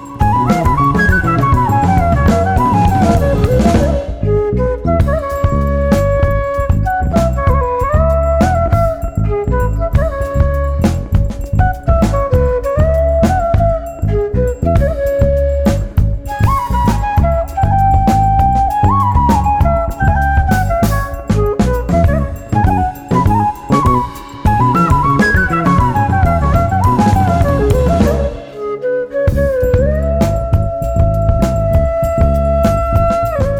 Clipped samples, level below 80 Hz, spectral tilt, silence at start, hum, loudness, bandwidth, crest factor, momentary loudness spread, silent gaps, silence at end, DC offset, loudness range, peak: under 0.1%; -18 dBFS; -7.5 dB/octave; 0 s; none; -13 LUFS; 17.5 kHz; 12 dB; 5 LU; none; 0 s; under 0.1%; 3 LU; 0 dBFS